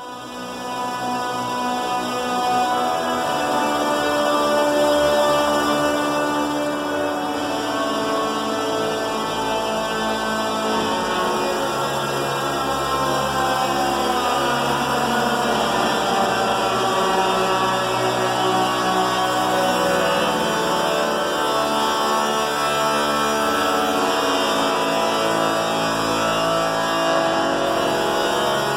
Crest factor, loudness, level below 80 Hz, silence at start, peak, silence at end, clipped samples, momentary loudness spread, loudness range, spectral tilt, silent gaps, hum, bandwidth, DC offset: 14 dB; -20 LUFS; -50 dBFS; 0 s; -6 dBFS; 0 s; under 0.1%; 4 LU; 3 LU; -3.5 dB/octave; none; none; 16 kHz; under 0.1%